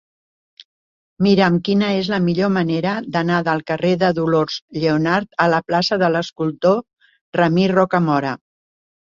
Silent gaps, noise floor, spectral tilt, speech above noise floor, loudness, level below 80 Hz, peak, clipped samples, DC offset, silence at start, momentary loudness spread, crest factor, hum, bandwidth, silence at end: 4.62-4.68 s, 7.21-7.33 s; under -90 dBFS; -7 dB/octave; over 73 dB; -18 LUFS; -56 dBFS; -2 dBFS; under 0.1%; under 0.1%; 1.2 s; 5 LU; 16 dB; none; 7.4 kHz; 0.75 s